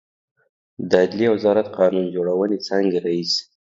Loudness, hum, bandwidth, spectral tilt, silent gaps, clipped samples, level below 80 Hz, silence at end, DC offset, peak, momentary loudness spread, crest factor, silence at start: -20 LUFS; none; 7.8 kHz; -5.5 dB/octave; none; under 0.1%; -64 dBFS; 0.2 s; under 0.1%; 0 dBFS; 5 LU; 20 dB; 0.8 s